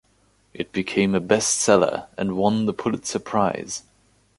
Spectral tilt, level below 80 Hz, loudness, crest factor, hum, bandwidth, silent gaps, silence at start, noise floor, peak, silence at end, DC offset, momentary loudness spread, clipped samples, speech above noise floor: -4 dB/octave; -56 dBFS; -22 LUFS; 22 dB; none; 11.5 kHz; none; 0.55 s; -62 dBFS; -2 dBFS; 0.6 s; under 0.1%; 12 LU; under 0.1%; 40 dB